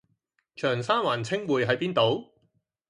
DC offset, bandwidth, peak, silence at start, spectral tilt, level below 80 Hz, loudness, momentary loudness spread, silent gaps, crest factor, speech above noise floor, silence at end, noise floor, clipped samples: under 0.1%; 11.5 kHz; -10 dBFS; 0.55 s; -5.5 dB/octave; -68 dBFS; -26 LUFS; 5 LU; none; 18 dB; 48 dB; 0.65 s; -74 dBFS; under 0.1%